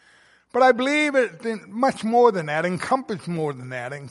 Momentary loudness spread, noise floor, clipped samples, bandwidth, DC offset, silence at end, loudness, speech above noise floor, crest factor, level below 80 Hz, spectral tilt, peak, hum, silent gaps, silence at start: 12 LU; -56 dBFS; under 0.1%; 11.5 kHz; under 0.1%; 0 s; -22 LUFS; 35 dB; 18 dB; -68 dBFS; -5.5 dB/octave; -4 dBFS; none; none; 0.55 s